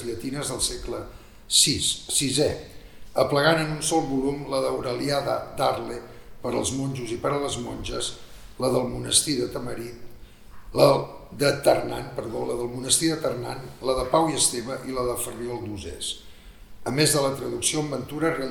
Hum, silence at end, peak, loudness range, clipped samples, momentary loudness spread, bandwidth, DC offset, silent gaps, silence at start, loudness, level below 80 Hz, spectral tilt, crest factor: none; 0 s; -2 dBFS; 5 LU; under 0.1%; 13 LU; 19 kHz; under 0.1%; none; 0 s; -24 LUFS; -46 dBFS; -3 dB/octave; 22 dB